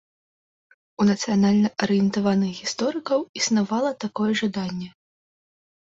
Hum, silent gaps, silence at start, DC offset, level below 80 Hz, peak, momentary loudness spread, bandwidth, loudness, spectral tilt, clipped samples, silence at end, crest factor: none; 3.29-3.34 s; 1 s; under 0.1%; -62 dBFS; -8 dBFS; 7 LU; 7.8 kHz; -23 LUFS; -5 dB/octave; under 0.1%; 1.05 s; 16 dB